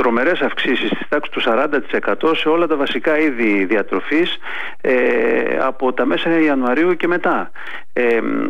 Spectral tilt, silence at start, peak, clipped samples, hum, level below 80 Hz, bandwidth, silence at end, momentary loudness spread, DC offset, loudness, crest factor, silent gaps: -6 dB/octave; 0 s; -6 dBFS; under 0.1%; none; -60 dBFS; 8.2 kHz; 0 s; 5 LU; 5%; -17 LUFS; 12 dB; none